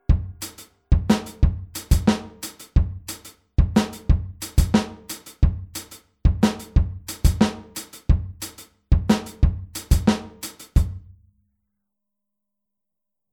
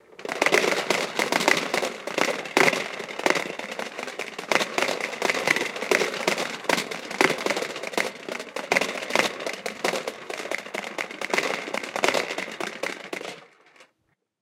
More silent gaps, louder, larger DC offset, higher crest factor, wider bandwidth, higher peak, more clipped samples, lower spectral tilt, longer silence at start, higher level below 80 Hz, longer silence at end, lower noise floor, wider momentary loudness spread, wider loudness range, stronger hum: neither; about the same, -23 LUFS vs -25 LUFS; neither; second, 20 dB vs 26 dB; first, 19 kHz vs 16.5 kHz; second, -4 dBFS vs 0 dBFS; neither; first, -6 dB/octave vs -2 dB/octave; about the same, 0.1 s vs 0.2 s; first, -26 dBFS vs -74 dBFS; first, 2.35 s vs 0.6 s; first, -85 dBFS vs -73 dBFS; first, 15 LU vs 12 LU; about the same, 3 LU vs 5 LU; neither